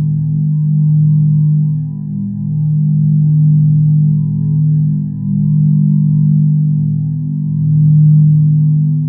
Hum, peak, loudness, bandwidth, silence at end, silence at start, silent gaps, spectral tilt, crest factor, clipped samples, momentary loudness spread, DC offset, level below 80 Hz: none; -2 dBFS; -12 LUFS; 0.8 kHz; 0 s; 0 s; none; -17 dB/octave; 8 dB; under 0.1%; 8 LU; under 0.1%; -48 dBFS